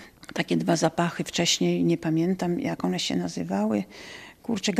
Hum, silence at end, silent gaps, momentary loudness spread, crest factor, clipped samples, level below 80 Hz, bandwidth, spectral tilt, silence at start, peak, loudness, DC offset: none; 0 s; none; 12 LU; 18 dB; under 0.1%; -62 dBFS; 14.5 kHz; -4.5 dB/octave; 0 s; -8 dBFS; -26 LUFS; under 0.1%